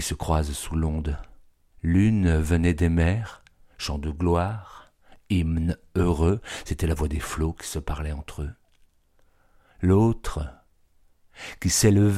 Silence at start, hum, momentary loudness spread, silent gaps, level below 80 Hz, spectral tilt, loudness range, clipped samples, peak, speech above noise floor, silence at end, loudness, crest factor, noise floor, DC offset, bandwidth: 0 s; none; 14 LU; none; -34 dBFS; -6 dB/octave; 5 LU; under 0.1%; -6 dBFS; 37 dB; 0 s; -25 LUFS; 18 dB; -61 dBFS; under 0.1%; 15 kHz